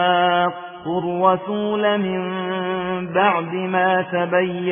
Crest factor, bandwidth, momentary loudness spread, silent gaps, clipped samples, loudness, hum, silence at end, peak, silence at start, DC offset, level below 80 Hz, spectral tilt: 16 dB; 3.6 kHz; 6 LU; none; under 0.1%; -20 LUFS; none; 0 s; -2 dBFS; 0 s; under 0.1%; -62 dBFS; -9.5 dB/octave